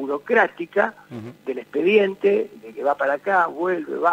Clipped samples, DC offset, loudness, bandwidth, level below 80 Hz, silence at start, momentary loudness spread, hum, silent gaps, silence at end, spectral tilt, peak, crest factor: under 0.1%; under 0.1%; -21 LUFS; 8.2 kHz; -72 dBFS; 0 s; 14 LU; none; none; 0 s; -6.5 dB/octave; -4 dBFS; 16 dB